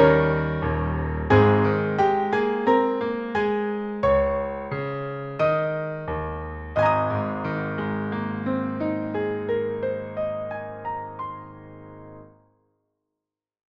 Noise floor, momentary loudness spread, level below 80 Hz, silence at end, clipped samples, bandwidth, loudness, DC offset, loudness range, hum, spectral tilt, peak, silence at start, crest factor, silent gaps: -86 dBFS; 12 LU; -42 dBFS; 1.45 s; under 0.1%; 7.4 kHz; -24 LUFS; under 0.1%; 10 LU; none; -9 dB/octave; -6 dBFS; 0 s; 18 dB; none